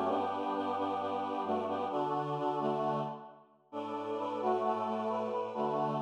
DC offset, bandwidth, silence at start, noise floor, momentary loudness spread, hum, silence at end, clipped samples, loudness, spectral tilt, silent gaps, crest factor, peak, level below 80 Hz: under 0.1%; 10 kHz; 0 s; -56 dBFS; 7 LU; none; 0 s; under 0.1%; -35 LUFS; -7.5 dB/octave; none; 14 dB; -20 dBFS; -88 dBFS